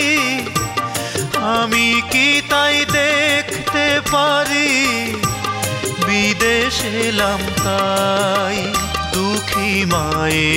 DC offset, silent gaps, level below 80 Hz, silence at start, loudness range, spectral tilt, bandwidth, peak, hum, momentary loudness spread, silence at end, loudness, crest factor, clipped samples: under 0.1%; none; -38 dBFS; 0 s; 3 LU; -3 dB/octave; 16.5 kHz; -2 dBFS; none; 6 LU; 0 s; -16 LUFS; 16 dB; under 0.1%